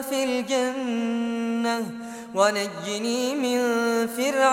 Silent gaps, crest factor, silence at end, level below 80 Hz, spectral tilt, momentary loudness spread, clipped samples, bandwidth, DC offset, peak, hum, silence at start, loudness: none; 18 dB; 0 s; -70 dBFS; -3.5 dB/octave; 7 LU; under 0.1%; 16.5 kHz; under 0.1%; -6 dBFS; none; 0 s; -25 LUFS